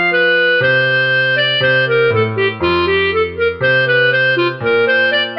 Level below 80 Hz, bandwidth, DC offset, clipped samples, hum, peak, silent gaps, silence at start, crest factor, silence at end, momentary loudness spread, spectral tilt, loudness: -46 dBFS; 5.8 kHz; under 0.1%; under 0.1%; none; -2 dBFS; none; 0 s; 12 dB; 0 s; 4 LU; -7.5 dB/octave; -13 LUFS